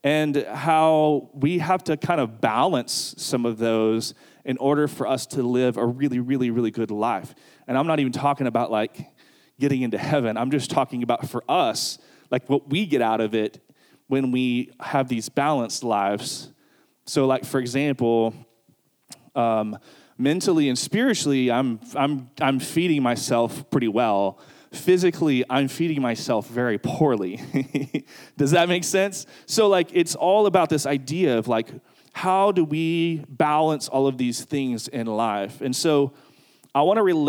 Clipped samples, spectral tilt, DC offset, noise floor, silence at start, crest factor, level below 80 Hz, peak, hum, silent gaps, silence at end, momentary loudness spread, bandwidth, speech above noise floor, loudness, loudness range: under 0.1%; -5 dB/octave; under 0.1%; -63 dBFS; 0.05 s; 18 dB; -72 dBFS; -4 dBFS; none; none; 0 s; 8 LU; 18.5 kHz; 41 dB; -23 LUFS; 3 LU